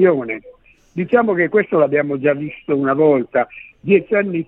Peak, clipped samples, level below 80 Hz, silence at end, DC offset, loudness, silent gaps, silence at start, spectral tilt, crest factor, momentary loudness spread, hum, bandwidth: -2 dBFS; under 0.1%; -58 dBFS; 0.05 s; under 0.1%; -17 LUFS; none; 0 s; -10 dB/octave; 16 dB; 12 LU; none; 4 kHz